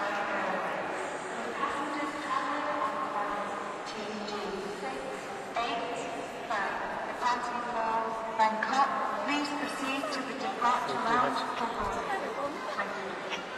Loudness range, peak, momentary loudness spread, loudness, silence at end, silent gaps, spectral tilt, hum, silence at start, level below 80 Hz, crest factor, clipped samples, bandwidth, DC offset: 5 LU; -14 dBFS; 9 LU; -32 LUFS; 0 s; none; -3.5 dB/octave; none; 0 s; -62 dBFS; 18 dB; under 0.1%; 14 kHz; under 0.1%